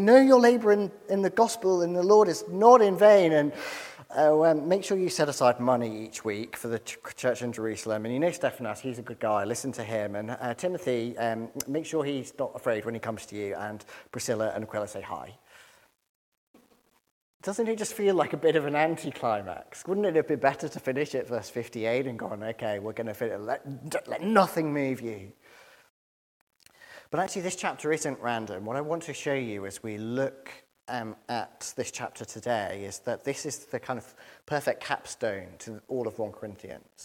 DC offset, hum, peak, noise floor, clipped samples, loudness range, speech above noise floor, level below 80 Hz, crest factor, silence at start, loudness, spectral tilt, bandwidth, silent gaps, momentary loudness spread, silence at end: under 0.1%; none; -4 dBFS; -66 dBFS; under 0.1%; 13 LU; 39 dB; -72 dBFS; 24 dB; 0 s; -28 LUFS; -5 dB/octave; 16.5 kHz; 16.09-16.54 s, 17.11-17.40 s, 25.90-26.47 s; 15 LU; 0 s